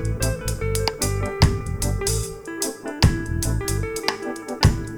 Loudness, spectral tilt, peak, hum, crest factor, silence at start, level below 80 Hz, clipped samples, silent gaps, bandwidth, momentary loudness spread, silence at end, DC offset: -23 LUFS; -4.5 dB/octave; -4 dBFS; none; 18 dB; 0 s; -28 dBFS; under 0.1%; none; over 20 kHz; 7 LU; 0 s; under 0.1%